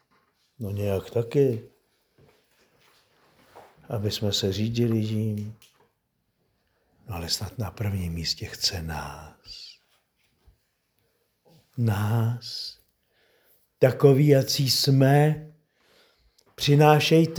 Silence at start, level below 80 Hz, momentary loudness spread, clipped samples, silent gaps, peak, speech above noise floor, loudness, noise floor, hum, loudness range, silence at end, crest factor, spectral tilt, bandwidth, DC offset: 0.6 s; -54 dBFS; 20 LU; under 0.1%; none; -2 dBFS; 51 dB; -24 LUFS; -74 dBFS; none; 11 LU; 0 s; 24 dB; -5.5 dB/octave; over 20 kHz; under 0.1%